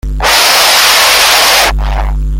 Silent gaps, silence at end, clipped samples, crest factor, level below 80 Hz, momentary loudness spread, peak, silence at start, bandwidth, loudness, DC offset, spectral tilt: none; 0 s; 0.7%; 8 dB; -16 dBFS; 11 LU; 0 dBFS; 0.05 s; over 20 kHz; -6 LUFS; under 0.1%; -1 dB/octave